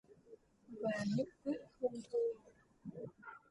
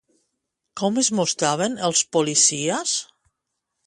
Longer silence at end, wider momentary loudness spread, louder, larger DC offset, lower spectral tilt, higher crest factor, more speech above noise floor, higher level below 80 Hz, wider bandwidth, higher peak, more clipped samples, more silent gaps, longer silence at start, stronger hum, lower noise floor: second, 0.15 s vs 0.85 s; first, 18 LU vs 9 LU; second, -42 LUFS vs -20 LUFS; neither; first, -7 dB/octave vs -2.5 dB/octave; about the same, 18 dB vs 20 dB; second, 24 dB vs 58 dB; second, -78 dBFS vs -68 dBFS; about the same, 11 kHz vs 11.5 kHz; second, -26 dBFS vs -4 dBFS; neither; neither; second, 0.1 s vs 0.75 s; neither; second, -63 dBFS vs -79 dBFS